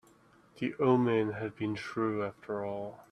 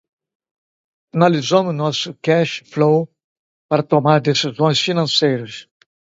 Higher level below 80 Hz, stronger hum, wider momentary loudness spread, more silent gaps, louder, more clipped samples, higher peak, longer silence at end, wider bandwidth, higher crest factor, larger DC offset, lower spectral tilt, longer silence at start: second, -70 dBFS vs -64 dBFS; neither; about the same, 11 LU vs 9 LU; second, none vs 3.24-3.69 s; second, -32 LUFS vs -17 LUFS; neither; second, -12 dBFS vs 0 dBFS; second, 0.1 s vs 0.4 s; first, 10.5 kHz vs 7.8 kHz; about the same, 20 dB vs 18 dB; neither; first, -8 dB/octave vs -5.5 dB/octave; second, 0.55 s vs 1.15 s